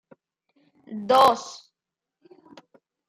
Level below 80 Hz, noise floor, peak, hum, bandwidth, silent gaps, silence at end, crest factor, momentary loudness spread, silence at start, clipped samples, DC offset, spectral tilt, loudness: -72 dBFS; -88 dBFS; -4 dBFS; none; 15.5 kHz; none; 1.55 s; 22 dB; 23 LU; 0.9 s; under 0.1%; under 0.1%; -3.5 dB/octave; -20 LUFS